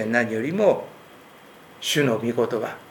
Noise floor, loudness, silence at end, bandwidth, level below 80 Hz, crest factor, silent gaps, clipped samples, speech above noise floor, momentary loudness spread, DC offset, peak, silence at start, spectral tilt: -48 dBFS; -23 LUFS; 0 s; over 20 kHz; -70 dBFS; 20 dB; none; under 0.1%; 25 dB; 8 LU; under 0.1%; -4 dBFS; 0 s; -4.5 dB/octave